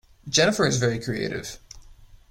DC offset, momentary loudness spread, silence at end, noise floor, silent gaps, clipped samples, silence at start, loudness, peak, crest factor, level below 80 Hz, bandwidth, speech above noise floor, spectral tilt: under 0.1%; 16 LU; 0.15 s; -49 dBFS; none; under 0.1%; 0.25 s; -23 LUFS; -6 dBFS; 18 dB; -50 dBFS; 16.5 kHz; 25 dB; -3.5 dB/octave